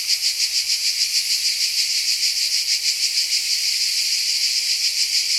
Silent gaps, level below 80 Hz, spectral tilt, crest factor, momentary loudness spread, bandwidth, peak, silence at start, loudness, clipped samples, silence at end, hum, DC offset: none; -62 dBFS; 5.5 dB/octave; 16 dB; 1 LU; 16.5 kHz; -6 dBFS; 0 s; -17 LUFS; under 0.1%; 0 s; none; under 0.1%